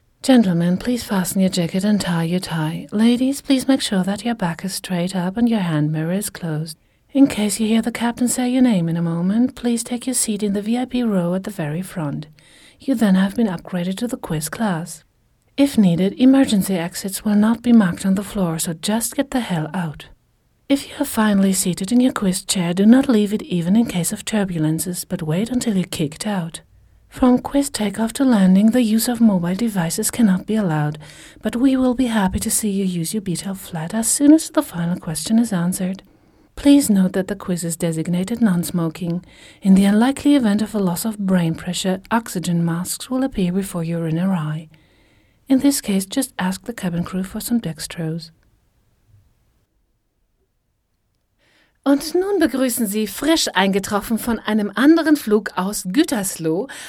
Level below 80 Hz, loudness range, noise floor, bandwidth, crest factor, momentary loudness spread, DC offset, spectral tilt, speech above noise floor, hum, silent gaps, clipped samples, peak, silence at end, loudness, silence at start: -48 dBFS; 5 LU; -68 dBFS; 17.5 kHz; 18 dB; 11 LU; under 0.1%; -5 dB/octave; 50 dB; none; none; under 0.1%; 0 dBFS; 0 s; -19 LUFS; 0.25 s